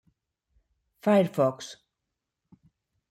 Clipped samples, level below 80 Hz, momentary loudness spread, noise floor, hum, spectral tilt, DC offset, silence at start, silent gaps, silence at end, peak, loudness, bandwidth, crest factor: under 0.1%; -74 dBFS; 19 LU; -85 dBFS; none; -6.5 dB/octave; under 0.1%; 1.05 s; none; 1.4 s; -10 dBFS; -25 LUFS; 15.5 kHz; 20 dB